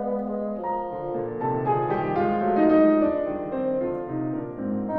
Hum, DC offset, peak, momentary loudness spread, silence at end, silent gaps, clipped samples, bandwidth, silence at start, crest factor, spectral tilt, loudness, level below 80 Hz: none; under 0.1%; -8 dBFS; 11 LU; 0 s; none; under 0.1%; 4.8 kHz; 0 s; 16 dB; -11 dB/octave; -25 LUFS; -52 dBFS